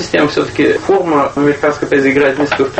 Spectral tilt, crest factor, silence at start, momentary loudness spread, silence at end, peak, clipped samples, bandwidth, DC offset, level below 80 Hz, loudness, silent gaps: -5.5 dB/octave; 12 dB; 0 s; 3 LU; 0 s; 0 dBFS; under 0.1%; 8.6 kHz; under 0.1%; -44 dBFS; -12 LUFS; none